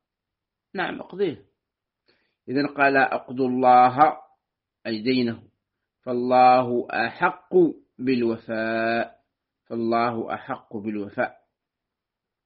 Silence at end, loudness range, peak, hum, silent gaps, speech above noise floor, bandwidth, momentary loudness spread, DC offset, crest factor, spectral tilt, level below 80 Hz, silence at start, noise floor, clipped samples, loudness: 1.15 s; 6 LU; -2 dBFS; none; none; 64 dB; 5 kHz; 15 LU; under 0.1%; 22 dB; -4 dB/octave; -68 dBFS; 0.75 s; -85 dBFS; under 0.1%; -23 LUFS